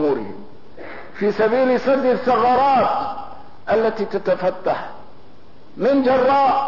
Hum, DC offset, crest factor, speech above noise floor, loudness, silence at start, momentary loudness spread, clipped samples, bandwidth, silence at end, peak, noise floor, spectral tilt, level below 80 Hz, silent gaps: none; 2%; 12 dB; 31 dB; -18 LUFS; 0 s; 20 LU; under 0.1%; 6 kHz; 0 s; -6 dBFS; -48 dBFS; -7 dB/octave; -54 dBFS; none